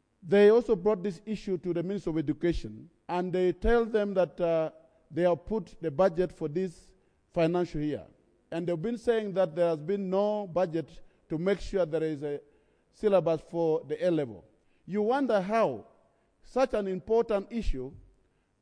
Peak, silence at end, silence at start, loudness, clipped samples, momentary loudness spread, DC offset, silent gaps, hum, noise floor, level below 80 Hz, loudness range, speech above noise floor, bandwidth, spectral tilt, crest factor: -12 dBFS; 0.6 s; 0.25 s; -29 LUFS; under 0.1%; 11 LU; under 0.1%; none; none; -68 dBFS; -46 dBFS; 3 LU; 40 dB; 10.5 kHz; -7.5 dB/octave; 18 dB